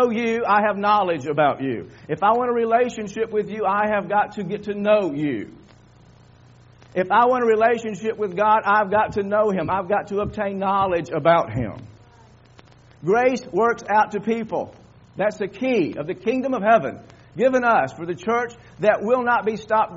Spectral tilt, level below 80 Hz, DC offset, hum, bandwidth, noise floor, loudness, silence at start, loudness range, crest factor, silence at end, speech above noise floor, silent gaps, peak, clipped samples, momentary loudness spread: -4.5 dB/octave; -54 dBFS; under 0.1%; none; 7.6 kHz; -50 dBFS; -21 LUFS; 0 s; 3 LU; 18 dB; 0 s; 29 dB; none; -4 dBFS; under 0.1%; 10 LU